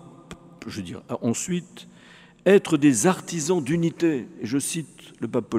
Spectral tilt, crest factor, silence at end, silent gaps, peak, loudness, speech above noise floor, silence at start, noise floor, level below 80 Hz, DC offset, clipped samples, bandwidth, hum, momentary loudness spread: -5 dB/octave; 22 dB; 0 s; none; -2 dBFS; -23 LUFS; 21 dB; 0.05 s; -45 dBFS; -64 dBFS; under 0.1%; under 0.1%; 15.5 kHz; none; 19 LU